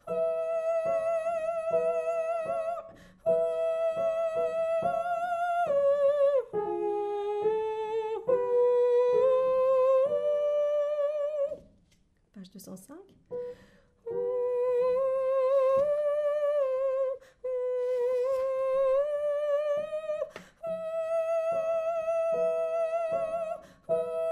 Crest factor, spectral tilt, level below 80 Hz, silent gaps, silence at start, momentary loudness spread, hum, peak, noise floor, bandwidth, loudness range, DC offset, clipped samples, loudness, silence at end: 12 dB; -5.5 dB/octave; -68 dBFS; none; 0.05 s; 11 LU; none; -16 dBFS; -67 dBFS; 11.5 kHz; 6 LU; under 0.1%; under 0.1%; -29 LUFS; 0 s